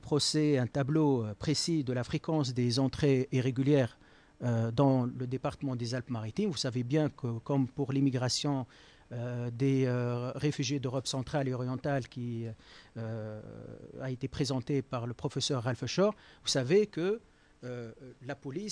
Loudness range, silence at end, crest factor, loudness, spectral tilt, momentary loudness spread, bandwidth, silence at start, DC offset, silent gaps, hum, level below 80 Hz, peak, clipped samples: 7 LU; 0 s; 16 dB; -32 LUFS; -6 dB/octave; 14 LU; 10.5 kHz; 0 s; under 0.1%; none; none; -60 dBFS; -16 dBFS; under 0.1%